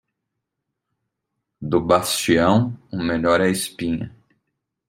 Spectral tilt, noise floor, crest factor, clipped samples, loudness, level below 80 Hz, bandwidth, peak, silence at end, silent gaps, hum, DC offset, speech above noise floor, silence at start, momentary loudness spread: -5 dB/octave; -80 dBFS; 20 dB; under 0.1%; -20 LUFS; -52 dBFS; 16 kHz; -2 dBFS; 0.8 s; none; none; under 0.1%; 61 dB; 1.6 s; 11 LU